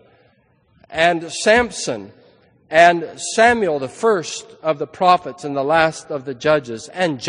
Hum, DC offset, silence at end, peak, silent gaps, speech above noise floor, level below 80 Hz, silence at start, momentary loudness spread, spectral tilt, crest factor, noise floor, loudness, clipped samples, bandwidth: none; under 0.1%; 0 s; 0 dBFS; none; 40 dB; -52 dBFS; 0.9 s; 13 LU; -3.5 dB/octave; 18 dB; -58 dBFS; -17 LUFS; under 0.1%; 10 kHz